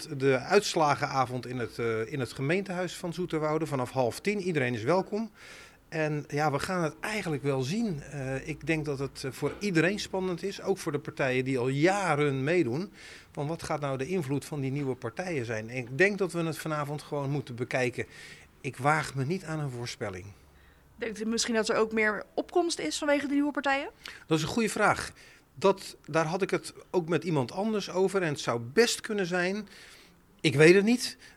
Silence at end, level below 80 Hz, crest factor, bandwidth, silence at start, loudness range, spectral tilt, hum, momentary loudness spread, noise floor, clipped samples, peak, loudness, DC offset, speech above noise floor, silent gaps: 0.05 s; -60 dBFS; 22 dB; 15.5 kHz; 0 s; 3 LU; -5 dB/octave; none; 10 LU; -58 dBFS; under 0.1%; -6 dBFS; -29 LUFS; under 0.1%; 28 dB; none